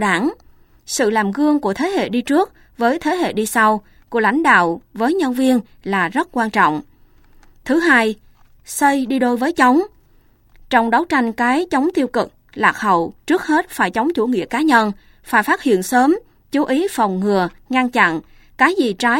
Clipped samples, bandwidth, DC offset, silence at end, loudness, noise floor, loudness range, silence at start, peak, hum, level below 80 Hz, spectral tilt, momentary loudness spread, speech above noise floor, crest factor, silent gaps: under 0.1%; 17 kHz; under 0.1%; 0 s; -17 LUFS; -52 dBFS; 2 LU; 0 s; 0 dBFS; none; -52 dBFS; -4.5 dB/octave; 8 LU; 36 dB; 18 dB; none